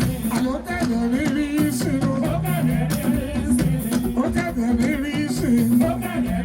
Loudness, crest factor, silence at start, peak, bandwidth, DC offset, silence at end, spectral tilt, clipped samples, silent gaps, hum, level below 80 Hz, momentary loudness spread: -21 LUFS; 14 dB; 0 s; -8 dBFS; 17.5 kHz; under 0.1%; 0 s; -6 dB/octave; under 0.1%; none; none; -36 dBFS; 4 LU